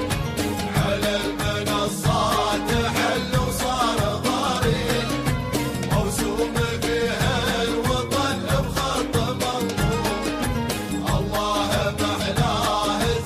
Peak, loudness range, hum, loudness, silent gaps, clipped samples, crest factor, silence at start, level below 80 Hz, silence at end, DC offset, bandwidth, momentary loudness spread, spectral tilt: -8 dBFS; 2 LU; none; -23 LUFS; none; under 0.1%; 14 dB; 0 s; -36 dBFS; 0 s; under 0.1%; 15.5 kHz; 3 LU; -4.5 dB/octave